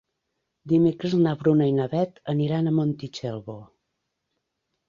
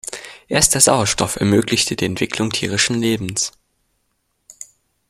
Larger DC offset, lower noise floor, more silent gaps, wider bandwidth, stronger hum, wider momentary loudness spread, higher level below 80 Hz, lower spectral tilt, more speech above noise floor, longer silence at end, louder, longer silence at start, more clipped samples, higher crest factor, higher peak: neither; first, -79 dBFS vs -69 dBFS; neither; second, 7.4 kHz vs 16 kHz; neither; second, 12 LU vs 19 LU; second, -64 dBFS vs -46 dBFS; first, -8.5 dB/octave vs -3 dB/octave; first, 56 dB vs 51 dB; first, 1.25 s vs 0.45 s; second, -24 LUFS vs -17 LUFS; first, 0.65 s vs 0.05 s; neither; about the same, 16 dB vs 20 dB; second, -8 dBFS vs 0 dBFS